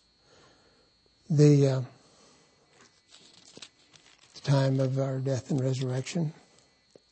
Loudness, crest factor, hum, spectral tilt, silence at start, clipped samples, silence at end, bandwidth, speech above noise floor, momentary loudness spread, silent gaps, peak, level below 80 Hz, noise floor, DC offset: -27 LUFS; 20 dB; none; -7.5 dB/octave; 1.3 s; under 0.1%; 0.8 s; 8.6 kHz; 40 dB; 25 LU; none; -10 dBFS; -72 dBFS; -65 dBFS; under 0.1%